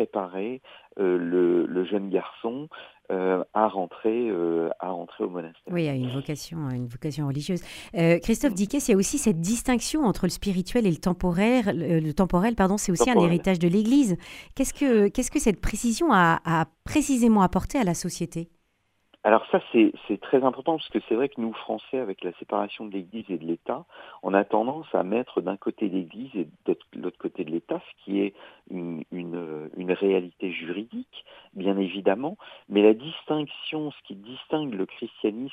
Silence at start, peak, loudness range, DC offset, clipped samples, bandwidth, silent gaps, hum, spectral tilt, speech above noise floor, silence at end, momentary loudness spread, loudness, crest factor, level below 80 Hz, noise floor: 0 s; -4 dBFS; 8 LU; under 0.1%; under 0.1%; 16 kHz; none; none; -5.5 dB/octave; 46 dB; 0 s; 13 LU; -26 LUFS; 22 dB; -46 dBFS; -71 dBFS